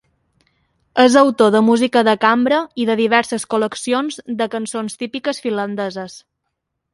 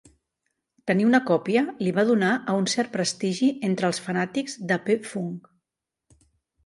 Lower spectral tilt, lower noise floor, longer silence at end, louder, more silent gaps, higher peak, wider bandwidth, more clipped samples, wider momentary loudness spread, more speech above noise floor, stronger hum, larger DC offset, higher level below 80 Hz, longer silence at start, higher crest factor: about the same, -4 dB/octave vs -5 dB/octave; second, -75 dBFS vs -87 dBFS; second, 0.75 s vs 1.25 s; first, -17 LUFS vs -24 LUFS; neither; first, 0 dBFS vs -8 dBFS; about the same, 11.5 kHz vs 11.5 kHz; neither; about the same, 12 LU vs 10 LU; second, 59 dB vs 63 dB; neither; neither; first, -62 dBFS vs -70 dBFS; about the same, 0.95 s vs 0.85 s; about the same, 18 dB vs 18 dB